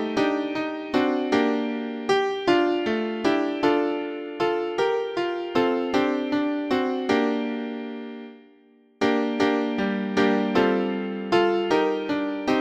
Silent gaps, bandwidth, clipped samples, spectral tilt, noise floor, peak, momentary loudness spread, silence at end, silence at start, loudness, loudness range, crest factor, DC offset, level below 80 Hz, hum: none; 8.8 kHz; under 0.1%; -5.5 dB/octave; -56 dBFS; -6 dBFS; 8 LU; 0 s; 0 s; -24 LUFS; 3 LU; 16 dB; under 0.1%; -62 dBFS; none